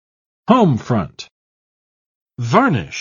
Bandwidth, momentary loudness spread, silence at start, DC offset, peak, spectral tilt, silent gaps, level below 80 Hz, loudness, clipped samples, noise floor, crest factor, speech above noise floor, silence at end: 7.4 kHz; 20 LU; 0.5 s; under 0.1%; 0 dBFS; -7 dB/octave; 1.31-2.26 s; -50 dBFS; -16 LUFS; under 0.1%; under -90 dBFS; 18 dB; over 75 dB; 0 s